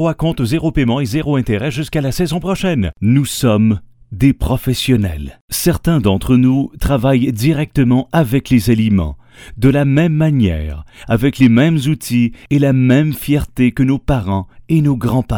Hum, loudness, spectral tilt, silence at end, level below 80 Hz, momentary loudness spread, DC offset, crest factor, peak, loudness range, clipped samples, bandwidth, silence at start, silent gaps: none; -15 LUFS; -6.5 dB/octave; 0 s; -30 dBFS; 6 LU; under 0.1%; 14 dB; 0 dBFS; 2 LU; under 0.1%; 19.5 kHz; 0 s; 5.41-5.48 s